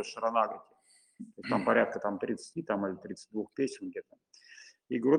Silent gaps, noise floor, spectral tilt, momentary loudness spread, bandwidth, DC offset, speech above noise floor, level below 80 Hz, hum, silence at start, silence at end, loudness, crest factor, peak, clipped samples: none; -56 dBFS; -5.5 dB/octave; 23 LU; 10.5 kHz; under 0.1%; 24 dB; -76 dBFS; none; 0 s; 0 s; -33 LUFS; 22 dB; -10 dBFS; under 0.1%